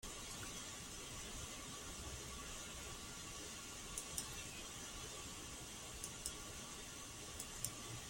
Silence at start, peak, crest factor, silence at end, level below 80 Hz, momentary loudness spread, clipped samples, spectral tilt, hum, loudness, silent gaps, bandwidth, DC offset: 0 s; -20 dBFS; 30 dB; 0 s; -60 dBFS; 4 LU; under 0.1%; -2 dB/octave; none; -48 LUFS; none; 16.5 kHz; under 0.1%